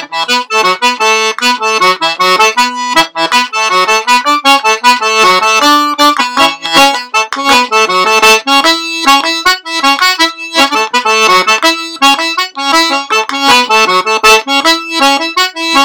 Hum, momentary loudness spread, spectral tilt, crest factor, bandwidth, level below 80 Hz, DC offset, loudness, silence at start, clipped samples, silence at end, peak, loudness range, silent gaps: none; 4 LU; -0.5 dB/octave; 10 dB; over 20 kHz; -46 dBFS; under 0.1%; -8 LUFS; 0 s; under 0.1%; 0 s; 0 dBFS; 1 LU; none